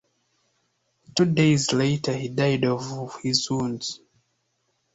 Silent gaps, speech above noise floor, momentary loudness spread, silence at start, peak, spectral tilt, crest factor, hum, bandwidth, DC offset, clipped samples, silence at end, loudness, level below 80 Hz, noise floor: none; 50 dB; 12 LU; 1.15 s; -4 dBFS; -5 dB/octave; 20 dB; none; 8.2 kHz; under 0.1%; under 0.1%; 1 s; -24 LUFS; -60 dBFS; -73 dBFS